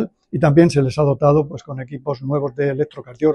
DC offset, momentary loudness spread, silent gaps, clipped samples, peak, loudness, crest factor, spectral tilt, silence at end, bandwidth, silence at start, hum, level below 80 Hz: under 0.1%; 14 LU; none; under 0.1%; 0 dBFS; -18 LUFS; 16 dB; -8 dB/octave; 0 s; 11 kHz; 0 s; none; -48 dBFS